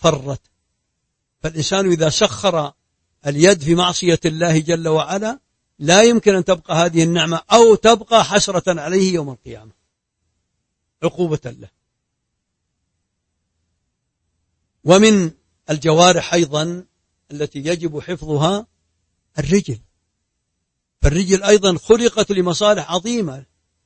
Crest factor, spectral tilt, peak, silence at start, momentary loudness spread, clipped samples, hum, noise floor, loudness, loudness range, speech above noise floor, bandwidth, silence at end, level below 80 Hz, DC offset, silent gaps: 18 dB; -4.5 dB/octave; 0 dBFS; 0 s; 16 LU; under 0.1%; none; -75 dBFS; -16 LUFS; 14 LU; 59 dB; 8.8 kHz; 0.45 s; -38 dBFS; under 0.1%; none